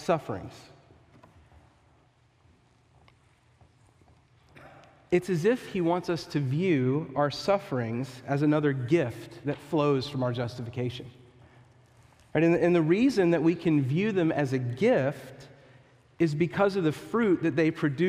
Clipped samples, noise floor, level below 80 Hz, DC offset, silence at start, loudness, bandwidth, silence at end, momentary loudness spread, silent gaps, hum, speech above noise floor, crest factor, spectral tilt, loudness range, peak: under 0.1%; -63 dBFS; -64 dBFS; under 0.1%; 0 s; -27 LUFS; 13.5 kHz; 0 s; 11 LU; none; none; 37 dB; 18 dB; -7.5 dB/octave; 7 LU; -10 dBFS